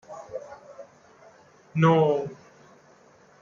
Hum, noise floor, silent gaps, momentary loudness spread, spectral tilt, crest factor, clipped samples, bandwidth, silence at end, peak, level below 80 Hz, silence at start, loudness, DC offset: none; -56 dBFS; none; 26 LU; -8 dB/octave; 20 dB; under 0.1%; 7.2 kHz; 1.05 s; -8 dBFS; -70 dBFS; 0.1 s; -23 LUFS; under 0.1%